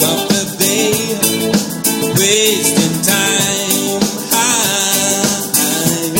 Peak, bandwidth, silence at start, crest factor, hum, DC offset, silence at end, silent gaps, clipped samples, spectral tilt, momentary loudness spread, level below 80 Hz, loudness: 0 dBFS; 17 kHz; 0 s; 14 dB; none; under 0.1%; 0 s; none; under 0.1%; -2.5 dB/octave; 4 LU; -50 dBFS; -12 LUFS